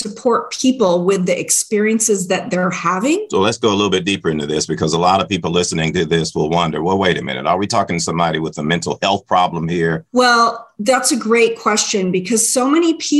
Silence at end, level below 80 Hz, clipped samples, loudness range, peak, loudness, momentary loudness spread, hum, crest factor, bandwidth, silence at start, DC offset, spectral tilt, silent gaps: 0 s; -50 dBFS; under 0.1%; 2 LU; -2 dBFS; -16 LUFS; 5 LU; none; 14 dB; 13 kHz; 0 s; under 0.1%; -4 dB/octave; none